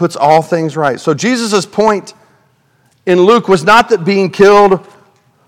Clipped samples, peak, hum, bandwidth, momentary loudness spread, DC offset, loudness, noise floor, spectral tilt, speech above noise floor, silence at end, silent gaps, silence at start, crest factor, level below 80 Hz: 1%; 0 dBFS; none; 14 kHz; 8 LU; under 0.1%; -10 LUFS; -54 dBFS; -5 dB/octave; 44 dB; 0.7 s; none; 0 s; 12 dB; -48 dBFS